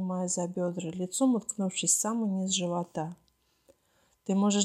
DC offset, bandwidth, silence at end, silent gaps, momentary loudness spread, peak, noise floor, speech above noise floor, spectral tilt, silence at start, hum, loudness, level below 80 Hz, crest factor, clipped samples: under 0.1%; 13.5 kHz; 0 s; none; 10 LU; -10 dBFS; -70 dBFS; 41 dB; -4 dB/octave; 0 s; none; -30 LUFS; -76 dBFS; 20 dB; under 0.1%